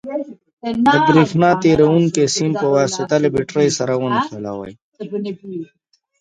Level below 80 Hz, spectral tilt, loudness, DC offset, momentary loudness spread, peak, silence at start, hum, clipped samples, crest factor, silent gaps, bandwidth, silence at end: -52 dBFS; -5.5 dB/octave; -16 LUFS; under 0.1%; 17 LU; 0 dBFS; 0.05 s; none; under 0.1%; 16 dB; 0.53-0.57 s, 4.82-4.92 s; 9.6 kHz; 0.55 s